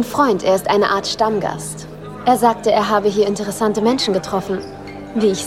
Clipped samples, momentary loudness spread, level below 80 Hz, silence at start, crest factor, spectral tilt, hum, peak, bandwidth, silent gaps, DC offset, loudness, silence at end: under 0.1%; 12 LU; -48 dBFS; 0 s; 16 dB; -4.5 dB/octave; none; -2 dBFS; 16.5 kHz; none; under 0.1%; -17 LUFS; 0 s